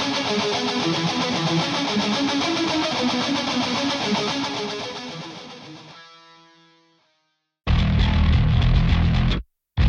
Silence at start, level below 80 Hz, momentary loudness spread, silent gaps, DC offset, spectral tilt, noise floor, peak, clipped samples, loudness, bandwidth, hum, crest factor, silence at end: 0 s; -28 dBFS; 15 LU; none; under 0.1%; -5 dB/octave; -72 dBFS; -8 dBFS; under 0.1%; -22 LUFS; 10.5 kHz; none; 14 dB; 0 s